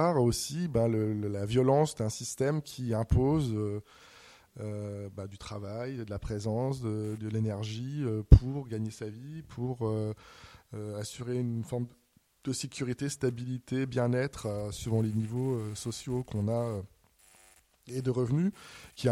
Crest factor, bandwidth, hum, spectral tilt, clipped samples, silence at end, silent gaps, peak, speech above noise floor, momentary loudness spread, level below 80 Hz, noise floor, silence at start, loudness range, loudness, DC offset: 28 dB; 14.5 kHz; none; -6.5 dB/octave; under 0.1%; 0 s; none; -4 dBFS; 32 dB; 14 LU; -40 dBFS; -62 dBFS; 0 s; 7 LU; -32 LUFS; under 0.1%